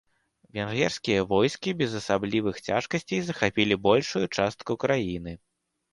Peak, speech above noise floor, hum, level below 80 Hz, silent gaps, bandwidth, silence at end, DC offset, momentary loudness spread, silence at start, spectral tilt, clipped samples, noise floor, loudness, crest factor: -6 dBFS; 38 dB; none; -56 dBFS; none; 11.5 kHz; 0.55 s; under 0.1%; 10 LU; 0.55 s; -5 dB/octave; under 0.1%; -64 dBFS; -26 LUFS; 20 dB